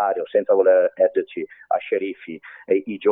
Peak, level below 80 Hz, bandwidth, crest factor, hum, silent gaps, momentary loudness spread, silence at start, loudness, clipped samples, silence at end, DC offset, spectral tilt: -6 dBFS; -74 dBFS; 3.9 kHz; 16 dB; none; none; 17 LU; 0 s; -20 LUFS; under 0.1%; 0 s; under 0.1%; -9.5 dB/octave